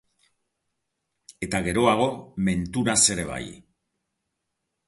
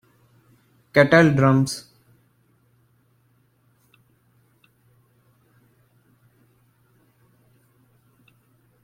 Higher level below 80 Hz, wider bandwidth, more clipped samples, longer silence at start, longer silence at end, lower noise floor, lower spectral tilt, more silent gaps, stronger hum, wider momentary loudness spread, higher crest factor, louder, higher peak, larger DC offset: first, -50 dBFS vs -62 dBFS; second, 12 kHz vs 15.5 kHz; neither; first, 1.4 s vs 0.95 s; second, 1.3 s vs 7.05 s; first, -80 dBFS vs -63 dBFS; second, -3.5 dB/octave vs -6.5 dB/octave; neither; neither; first, 16 LU vs 12 LU; about the same, 20 dB vs 24 dB; second, -23 LUFS vs -18 LUFS; second, -6 dBFS vs -2 dBFS; neither